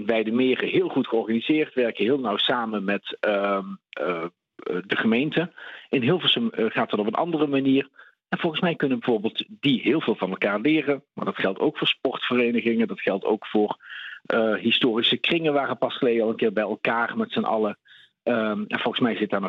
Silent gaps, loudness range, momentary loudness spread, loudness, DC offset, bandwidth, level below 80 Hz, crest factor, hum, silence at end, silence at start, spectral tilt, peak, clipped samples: none; 2 LU; 8 LU; -24 LUFS; under 0.1%; 6.2 kHz; -72 dBFS; 18 dB; none; 0 s; 0 s; -7.5 dB/octave; -6 dBFS; under 0.1%